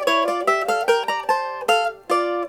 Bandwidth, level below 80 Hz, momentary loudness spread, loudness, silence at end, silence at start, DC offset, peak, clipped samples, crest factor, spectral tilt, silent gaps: 18.5 kHz; -64 dBFS; 3 LU; -21 LUFS; 0 s; 0 s; under 0.1%; -6 dBFS; under 0.1%; 16 dB; -2 dB/octave; none